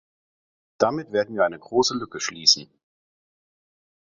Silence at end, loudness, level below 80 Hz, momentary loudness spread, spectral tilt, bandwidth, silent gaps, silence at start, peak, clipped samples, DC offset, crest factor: 1.5 s; -22 LUFS; -66 dBFS; 8 LU; -2 dB/octave; 7.8 kHz; none; 0.8 s; -2 dBFS; under 0.1%; under 0.1%; 24 dB